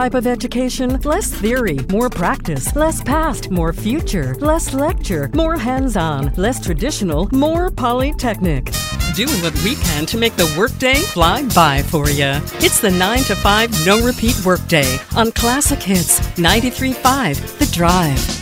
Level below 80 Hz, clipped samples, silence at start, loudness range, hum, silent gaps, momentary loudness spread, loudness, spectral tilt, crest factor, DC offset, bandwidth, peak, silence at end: -26 dBFS; under 0.1%; 0 s; 4 LU; none; none; 6 LU; -16 LUFS; -4 dB/octave; 16 dB; under 0.1%; 17 kHz; 0 dBFS; 0 s